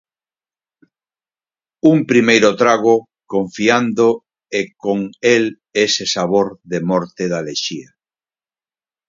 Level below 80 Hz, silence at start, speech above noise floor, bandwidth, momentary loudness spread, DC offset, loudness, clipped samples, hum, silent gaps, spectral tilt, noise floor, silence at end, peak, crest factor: -60 dBFS; 1.85 s; over 75 dB; 7.6 kHz; 10 LU; under 0.1%; -16 LUFS; under 0.1%; none; none; -4.5 dB/octave; under -90 dBFS; 1.25 s; 0 dBFS; 18 dB